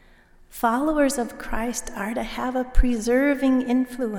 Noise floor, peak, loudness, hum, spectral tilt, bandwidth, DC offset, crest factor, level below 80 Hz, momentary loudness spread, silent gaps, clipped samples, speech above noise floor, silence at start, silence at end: -52 dBFS; -4 dBFS; -24 LUFS; none; -5 dB/octave; 17.5 kHz; under 0.1%; 18 dB; -30 dBFS; 9 LU; none; under 0.1%; 30 dB; 0.5 s; 0 s